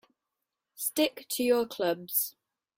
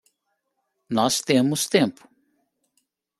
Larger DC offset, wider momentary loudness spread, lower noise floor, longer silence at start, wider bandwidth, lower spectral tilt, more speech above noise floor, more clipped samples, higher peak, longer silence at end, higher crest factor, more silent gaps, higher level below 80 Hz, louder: neither; about the same, 6 LU vs 6 LU; first, -87 dBFS vs -76 dBFS; about the same, 0.8 s vs 0.9 s; first, 16.5 kHz vs 14.5 kHz; second, -2.5 dB/octave vs -4 dB/octave; about the same, 57 dB vs 55 dB; neither; second, -12 dBFS vs -4 dBFS; second, 0.5 s vs 1.3 s; about the same, 20 dB vs 22 dB; neither; second, -74 dBFS vs -66 dBFS; second, -29 LUFS vs -22 LUFS